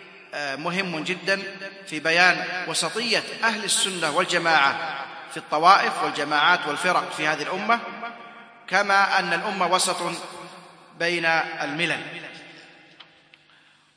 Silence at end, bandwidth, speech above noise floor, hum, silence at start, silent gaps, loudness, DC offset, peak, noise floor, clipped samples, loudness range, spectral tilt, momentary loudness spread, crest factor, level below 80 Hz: 1.3 s; 10.5 kHz; 34 dB; none; 0 s; none; -22 LUFS; under 0.1%; 0 dBFS; -57 dBFS; under 0.1%; 5 LU; -2 dB/octave; 17 LU; 24 dB; -80 dBFS